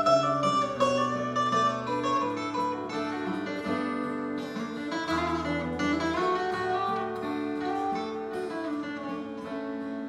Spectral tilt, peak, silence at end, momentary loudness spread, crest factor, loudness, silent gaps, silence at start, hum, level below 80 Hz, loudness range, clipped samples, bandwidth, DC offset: -5 dB/octave; -12 dBFS; 0 s; 9 LU; 16 dB; -29 LUFS; none; 0 s; none; -62 dBFS; 4 LU; under 0.1%; 12 kHz; under 0.1%